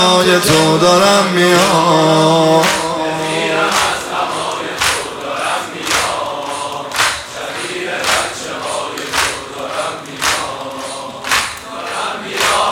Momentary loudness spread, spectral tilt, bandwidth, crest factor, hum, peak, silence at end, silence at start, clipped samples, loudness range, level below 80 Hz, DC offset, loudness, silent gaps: 12 LU; -3 dB/octave; 17 kHz; 14 dB; none; 0 dBFS; 0 s; 0 s; under 0.1%; 7 LU; -46 dBFS; under 0.1%; -14 LUFS; none